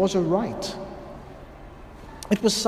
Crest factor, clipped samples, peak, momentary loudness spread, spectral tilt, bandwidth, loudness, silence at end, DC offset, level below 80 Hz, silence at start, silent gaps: 20 dB; under 0.1%; -6 dBFS; 22 LU; -4.5 dB/octave; 15.5 kHz; -26 LUFS; 0 s; under 0.1%; -48 dBFS; 0 s; none